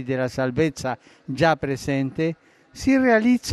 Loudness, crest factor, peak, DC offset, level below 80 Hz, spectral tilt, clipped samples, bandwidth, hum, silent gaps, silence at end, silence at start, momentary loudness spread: -22 LUFS; 16 dB; -6 dBFS; under 0.1%; -50 dBFS; -6 dB/octave; under 0.1%; 12.5 kHz; none; none; 0 s; 0 s; 13 LU